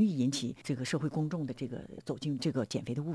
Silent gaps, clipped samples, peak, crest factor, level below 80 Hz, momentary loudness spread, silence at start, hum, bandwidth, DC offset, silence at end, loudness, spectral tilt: none; under 0.1%; -18 dBFS; 16 dB; -66 dBFS; 8 LU; 0 s; none; 11 kHz; under 0.1%; 0 s; -35 LUFS; -6 dB/octave